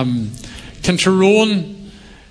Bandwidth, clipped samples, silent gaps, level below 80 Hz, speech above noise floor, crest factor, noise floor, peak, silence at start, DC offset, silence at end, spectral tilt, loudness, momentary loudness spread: 11 kHz; under 0.1%; none; -42 dBFS; 24 dB; 16 dB; -38 dBFS; 0 dBFS; 0 s; under 0.1%; 0.35 s; -5 dB/octave; -15 LUFS; 21 LU